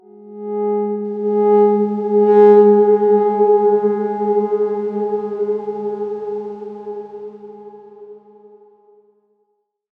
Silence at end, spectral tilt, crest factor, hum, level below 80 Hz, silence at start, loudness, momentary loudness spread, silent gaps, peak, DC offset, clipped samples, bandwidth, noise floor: 1.8 s; -10.5 dB/octave; 16 dB; none; -74 dBFS; 0.2 s; -15 LUFS; 20 LU; none; -2 dBFS; under 0.1%; under 0.1%; 3.1 kHz; -68 dBFS